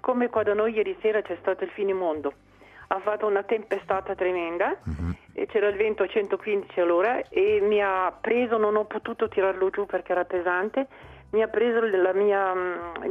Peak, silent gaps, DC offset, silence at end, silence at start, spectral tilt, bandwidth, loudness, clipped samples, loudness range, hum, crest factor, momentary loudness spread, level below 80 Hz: -6 dBFS; none; under 0.1%; 0 s; 0.05 s; -7.5 dB/octave; 3.9 kHz; -25 LUFS; under 0.1%; 4 LU; none; 18 dB; 8 LU; -54 dBFS